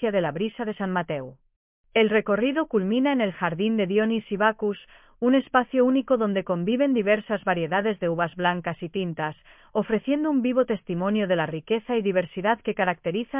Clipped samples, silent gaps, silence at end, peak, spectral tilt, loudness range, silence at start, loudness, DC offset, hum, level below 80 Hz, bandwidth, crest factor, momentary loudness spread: under 0.1%; 1.56-1.84 s; 0 s; -6 dBFS; -10 dB/octave; 3 LU; 0 s; -25 LUFS; under 0.1%; none; -62 dBFS; 3.8 kHz; 18 dB; 8 LU